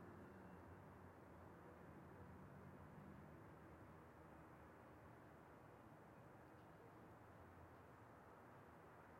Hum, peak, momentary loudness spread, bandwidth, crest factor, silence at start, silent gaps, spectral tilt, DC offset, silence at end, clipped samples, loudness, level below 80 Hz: none; -50 dBFS; 3 LU; 15.5 kHz; 14 dB; 0 s; none; -7.5 dB/octave; under 0.1%; 0 s; under 0.1%; -63 LUFS; -78 dBFS